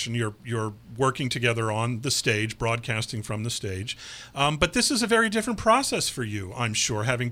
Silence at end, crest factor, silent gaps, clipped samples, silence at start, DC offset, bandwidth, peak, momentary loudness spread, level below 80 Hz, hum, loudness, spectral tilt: 0 s; 22 dB; none; under 0.1%; 0 s; under 0.1%; 16 kHz; -4 dBFS; 10 LU; -50 dBFS; none; -25 LUFS; -3.5 dB/octave